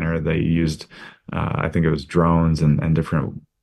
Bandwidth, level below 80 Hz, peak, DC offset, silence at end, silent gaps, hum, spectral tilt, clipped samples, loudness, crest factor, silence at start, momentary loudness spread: 10 kHz; -36 dBFS; -4 dBFS; under 0.1%; 0.25 s; none; none; -8 dB/octave; under 0.1%; -20 LUFS; 16 dB; 0 s; 13 LU